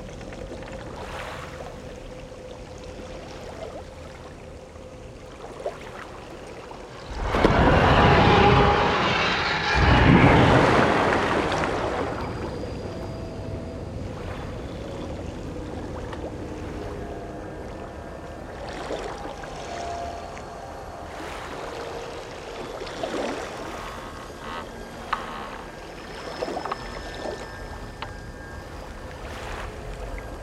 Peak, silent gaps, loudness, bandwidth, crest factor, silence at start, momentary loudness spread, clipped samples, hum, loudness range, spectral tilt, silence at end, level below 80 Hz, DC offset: -4 dBFS; none; -24 LUFS; 14 kHz; 22 dB; 0 s; 22 LU; under 0.1%; none; 20 LU; -6 dB/octave; 0 s; -36 dBFS; under 0.1%